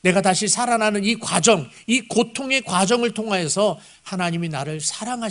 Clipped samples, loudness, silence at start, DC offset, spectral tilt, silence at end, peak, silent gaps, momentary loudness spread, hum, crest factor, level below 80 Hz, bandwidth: under 0.1%; -20 LUFS; 0.05 s; under 0.1%; -3.5 dB/octave; 0 s; 0 dBFS; none; 8 LU; none; 20 dB; -60 dBFS; 11 kHz